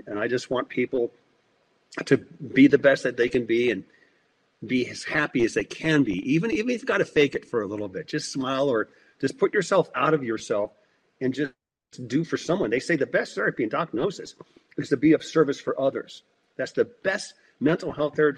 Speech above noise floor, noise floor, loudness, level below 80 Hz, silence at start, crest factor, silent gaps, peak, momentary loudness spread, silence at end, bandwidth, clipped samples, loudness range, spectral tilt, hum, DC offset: 42 dB; -67 dBFS; -25 LUFS; -62 dBFS; 0.05 s; 20 dB; none; -4 dBFS; 11 LU; 0 s; 10.5 kHz; under 0.1%; 4 LU; -5.5 dB/octave; none; under 0.1%